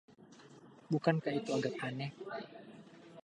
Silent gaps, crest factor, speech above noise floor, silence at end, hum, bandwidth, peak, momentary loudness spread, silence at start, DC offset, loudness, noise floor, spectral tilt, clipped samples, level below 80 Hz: none; 24 dB; 22 dB; 0.05 s; none; 10 kHz; -14 dBFS; 24 LU; 0.1 s; under 0.1%; -37 LUFS; -58 dBFS; -6.5 dB/octave; under 0.1%; -82 dBFS